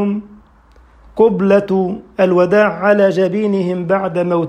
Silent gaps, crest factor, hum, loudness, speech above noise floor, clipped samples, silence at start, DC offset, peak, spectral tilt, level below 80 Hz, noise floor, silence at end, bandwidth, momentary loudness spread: none; 14 dB; none; -14 LUFS; 33 dB; under 0.1%; 0 s; under 0.1%; 0 dBFS; -8 dB/octave; -50 dBFS; -47 dBFS; 0 s; 9 kHz; 8 LU